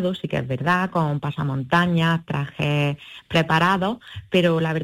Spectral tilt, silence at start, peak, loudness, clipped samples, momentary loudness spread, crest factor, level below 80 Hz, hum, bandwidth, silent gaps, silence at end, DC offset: -6.5 dB/octave; 0 s; -6 dBFS; -22 LUFS; under 0.1%; 8 LU; 14 dB; -54 dBFS; none; 15 kHz; none; 0 s; under 0.1%